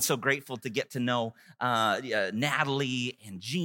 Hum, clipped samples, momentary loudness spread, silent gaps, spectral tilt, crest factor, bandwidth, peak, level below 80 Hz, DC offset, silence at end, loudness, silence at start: none; under 0.1%; 8 LU; none; -3.5 dB/octave; 20 dB; 17 kHz; -10 dBFS; -78 dBFS; under 0.1%; 0 s; -29 LUFS; 0 s